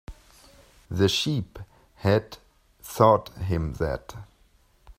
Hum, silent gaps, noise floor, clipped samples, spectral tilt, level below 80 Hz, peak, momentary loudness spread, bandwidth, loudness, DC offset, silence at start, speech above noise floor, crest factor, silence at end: none; none; -61 dBFS; under 0.1%; -5.5 dB/octave; -46 dBFS; -2 dBFS; 25 LU; 16 kHz; -25 LUFS; under 0.1%; 0.1 s; 37 dB; 24 dB; 0.05 s